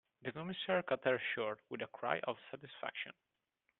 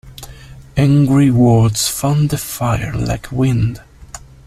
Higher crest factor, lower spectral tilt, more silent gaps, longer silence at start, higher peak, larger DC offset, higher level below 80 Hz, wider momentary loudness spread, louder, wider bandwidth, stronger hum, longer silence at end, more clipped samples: first, 24 dB vs 14 dB; second, -2.5 dB/octave vs -6 dB/octave; neither; first, 0.2 s vs 0.05 s; second, -18 dBFS vs -2 dBFS; neither; second, -82 dBFS vs -36 dBFS; second, 12 LU vs 24 LU; second, -40 LUFS vs -15 LUFS; second, 4.2 kHz vs 15.5 kHz; neither; first, 0.7 s vs 0.3 s; neither